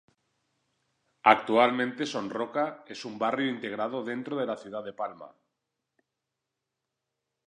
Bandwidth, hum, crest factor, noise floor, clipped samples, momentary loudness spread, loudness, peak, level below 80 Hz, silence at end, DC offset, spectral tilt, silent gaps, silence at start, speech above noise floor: 10.5 kHz; none; 26 dB; -85 dBFS; under 0.1%; 15 LU; -28 LUFS; -4 dBFS; -82 dBFS; 2.2 s; under 0.1%; -5 dB/octave; none; 1.25 s; 57 dB